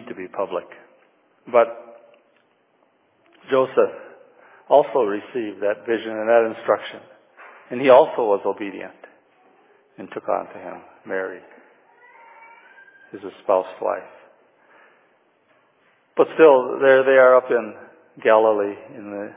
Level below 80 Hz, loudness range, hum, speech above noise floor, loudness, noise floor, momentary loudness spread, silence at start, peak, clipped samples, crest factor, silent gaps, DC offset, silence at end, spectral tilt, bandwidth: -76 dBFS; 15 LU; none; 43 dB; -19 LUFS; -62 dBFS; 22 LU; 0 s; 0 dBFS; under 0.1%; 20 dB; none; under 0.1%; 0.1 s; -8.5 dB/octave; 3.8 kHz